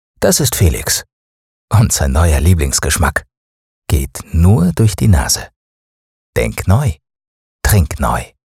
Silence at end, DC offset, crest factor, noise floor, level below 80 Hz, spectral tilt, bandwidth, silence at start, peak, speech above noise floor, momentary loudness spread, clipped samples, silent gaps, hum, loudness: 0.3 s; under 0.1%; 12 dB; under -90 dBFS; -24 dBFS; -4.5 dB/octave; 16.5 kHz; 0.2 s; -2 dBFS; over 78 dB; 8 LU; under 0.1%; 1.13-1.68 s, 3.37-3.82 s, 5.56-6.33 s, 7.27-7.59 s; none; -14 LUFS